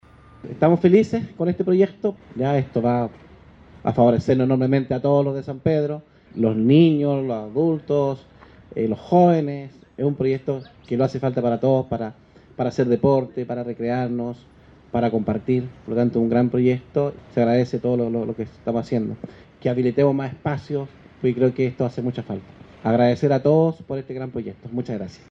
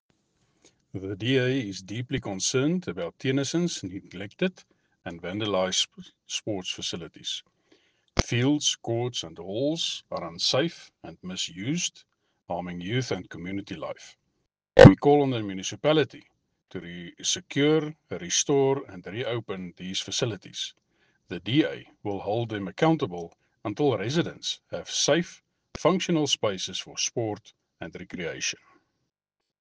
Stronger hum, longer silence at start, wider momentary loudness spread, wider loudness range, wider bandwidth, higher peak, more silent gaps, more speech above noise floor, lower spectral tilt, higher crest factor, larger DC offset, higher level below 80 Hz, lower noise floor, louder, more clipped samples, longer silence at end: neither; second, 0.45 s vs 0.95 s; about the same, 13 LU vs 15 LU; second, 4 LU vs 9 LU; second, 7.6 kHz vs 10 kHz; about the same, -2 dBFS vs -2 dBFS; neither; second, 27 dB vs 59 dB; first, -9 dB/octave vs -4.5 dB/octave; second, 18 dB vs 24 dB; neither; about the same, -54 dBFS vs -50 dBFS; second, -47 dBFS vs -86 dBFS; first, -21 LUFS vs -26 LUFS; neither; second, 0.2 s vs 1.05 s